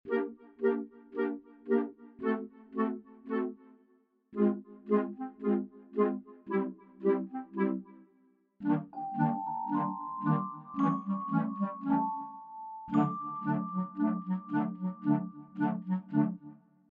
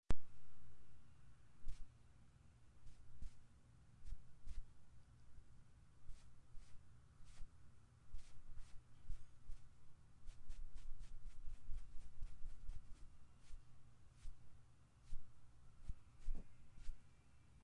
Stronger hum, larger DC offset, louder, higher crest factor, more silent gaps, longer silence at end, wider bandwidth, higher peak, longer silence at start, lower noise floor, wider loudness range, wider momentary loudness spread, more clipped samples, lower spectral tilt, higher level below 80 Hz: neither; neither; first, -33 LUFS vs -62 LUFS; about the same, 18 dB vs 20 dB; neither; first, 0.35 s vs 0 s; second, 4.1 kHz vs 8.8 kHz; first, -16 dBFS vs -24 dBFS; about the same, 0.05 s vs 0.1 s; about the same, -69 dBFS vs -66 dBFS; second, 2 LU vs 5 LU; about the same, 10 LU vs 10 LU; neither; first, -8.5 dB/octave vs -6 dB/octave; second, -76 dBFS vs -54 dBFS